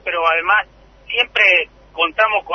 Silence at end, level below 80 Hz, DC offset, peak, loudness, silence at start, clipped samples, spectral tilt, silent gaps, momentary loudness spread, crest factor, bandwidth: 0 s; -50 dBFS; under 0.1%; -2 dBFS; -15 LUFS; 0.05 s; under 0.1%; -2 dB/octave; none; 11 LU; 16 dB; 6.6 kHz